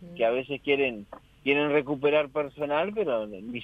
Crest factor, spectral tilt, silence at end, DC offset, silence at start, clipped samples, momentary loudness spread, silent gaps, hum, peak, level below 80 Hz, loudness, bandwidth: 18 dB; -7 dB/octave; 0 s; under 0.1%; 0 s; under 0.1%; 7 LU; none; none; -10 dBFS; -62 dBFS; -27 LUFS; 4.9 kHz